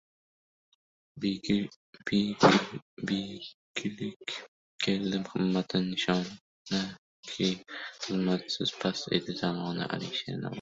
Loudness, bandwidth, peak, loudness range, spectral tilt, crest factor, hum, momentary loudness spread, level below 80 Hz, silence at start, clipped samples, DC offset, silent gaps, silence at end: -31 LUFS; 7.8 kHz; -6 dBFS; 3 LU; -5 dB/octave; 26 dB; none; 12 LU; -66 dBFS; 1.15 s; under 0.1%; under 0.1%; 1.76-1.93 s, 2.82-2.97 s, 3.54-3.74 s, 4.16-4.20 s, 4.48-4.79 s, 6.41-6.65 s, 6.98-7.23 s; 0 s